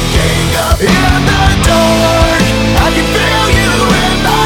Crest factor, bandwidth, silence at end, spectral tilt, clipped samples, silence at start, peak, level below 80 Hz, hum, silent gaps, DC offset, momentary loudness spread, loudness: 10 dB; 19.5 kHz; 0 s; -4.5 dB/octave; under 0.1%; 0 s; 0 dBFS; -16 dBFS; none; none; under 0.1%; 2 LU; -9 LUFS